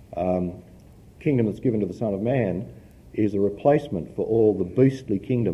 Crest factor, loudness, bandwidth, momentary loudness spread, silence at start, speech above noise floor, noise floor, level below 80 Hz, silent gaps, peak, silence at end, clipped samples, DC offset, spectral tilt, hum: 18 dB; -24 LUFS; 11.5 kHz; 11 LU; 0 s; 25 dB; -48 dBFS; -48 dBFS; none; -6 dBFS; 0 s; under 0.1%; under 0.1%; -9.5 dB/octave; none